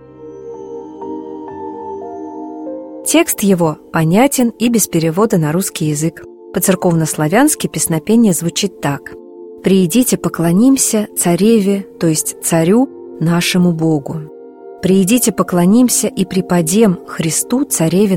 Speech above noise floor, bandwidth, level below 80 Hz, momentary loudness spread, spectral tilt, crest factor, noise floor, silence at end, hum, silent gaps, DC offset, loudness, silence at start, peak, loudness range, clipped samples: 21 dB; 16.5 kHz; -50 dBFS; 16 LU; -5 dB/octave; 14 dB; -34 dBFS; 0 s; none; none; under 0.1%; -13 LUFS; 0.2 s; 0 dBFS; 3 LU; under 0.1%